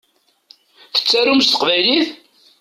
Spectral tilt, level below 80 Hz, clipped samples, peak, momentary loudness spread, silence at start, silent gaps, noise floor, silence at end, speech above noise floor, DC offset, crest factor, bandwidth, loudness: -2 dB/octave; -64 dBFS; under 0.1%; -2 dBFS; 7 LU; 0.95 s; none; -51 dBFS; 0.45 s; 36 dB; under 0.1%; 16 dB; 15 kHz; -14 LUFS